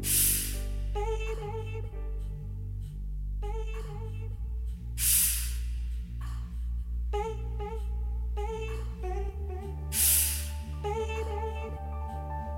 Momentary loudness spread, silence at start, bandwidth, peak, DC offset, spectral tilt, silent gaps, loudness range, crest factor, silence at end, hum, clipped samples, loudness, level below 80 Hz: 15 LU; 0 s; 17 kHz; -12 dBFS; under 0.1%; -3 dB/octave; none; 8 LU; 20 dB; 0 s; none; under 0.1%; -31 LUFS; -34 dBFS